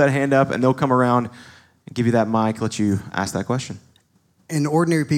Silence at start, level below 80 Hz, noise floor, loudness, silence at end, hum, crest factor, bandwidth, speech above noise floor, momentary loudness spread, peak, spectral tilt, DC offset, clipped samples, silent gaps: 0 s; -62 dBFS; -61 dBFS; -20 LUFS; 0 s; none; 16 dB; 16 kHz; 42 dB; 10 LU; -4 dBFS; -6.5 dB/octave; under 0.1%; under 0.1%; none